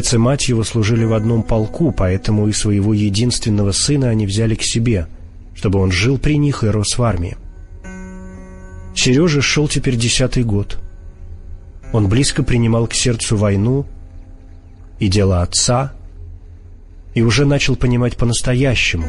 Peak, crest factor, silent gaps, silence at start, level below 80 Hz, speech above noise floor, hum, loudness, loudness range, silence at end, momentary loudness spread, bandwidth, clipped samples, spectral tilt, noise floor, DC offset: -2 dBFS; 14 dB; none; 0 s; -28 dBFS; 22 dB; none; -16 LUFS; 2 LU; 0 s; 17 LU; 11.5 kHz; under 0.1%; -5 dB/octave; -37 dBFS; under 0.1%